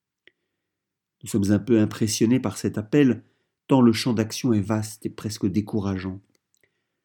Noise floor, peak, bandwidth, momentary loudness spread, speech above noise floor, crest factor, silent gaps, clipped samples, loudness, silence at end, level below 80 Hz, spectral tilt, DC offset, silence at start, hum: -84 dBFS; -4 dBFS; 18 kHz; 12 LU; 62 dB; 20 dB; none; under 0.1%; -23 LUFS; 0.85 s; -64 dBFS; -6 dB/octave; under 0.1%; 1.25 s; none